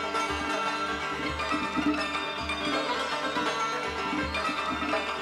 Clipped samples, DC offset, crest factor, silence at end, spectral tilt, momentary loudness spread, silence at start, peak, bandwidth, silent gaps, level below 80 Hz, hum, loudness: under 0.1%; under 0.1%; 14 dB; 0 s; -3.5 dB/octave; 3 LU; 0 s; -16 dBFS; 15.5 kHz; none; -50 dBFS; none; -29 LUFS